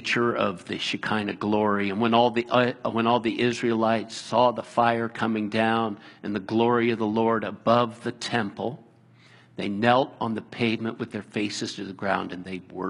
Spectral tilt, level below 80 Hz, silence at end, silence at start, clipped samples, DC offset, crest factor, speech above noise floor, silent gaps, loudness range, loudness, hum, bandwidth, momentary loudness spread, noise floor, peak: -5.5 dB/octave; -66 dBFS; 0 s; 0 s; under 0.1%; under 0.1%; 22 dB; 29 dB; none; 4 LU; -25 LUFS; none; 11 kHz; 11 LU; -54 dBFS; -4 dBFS